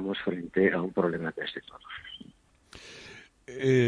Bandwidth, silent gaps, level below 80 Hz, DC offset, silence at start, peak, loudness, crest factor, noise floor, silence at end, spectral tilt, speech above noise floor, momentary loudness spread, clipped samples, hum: 10 kHz; none; -64 dBFS; under 0.1%; 0 s; -10 dBFS; -29 LUFS; 20 dB; -57 dBFS; 0 s; -6.5 dB/octave; 29 dB; 21 LU; under 0.1%; none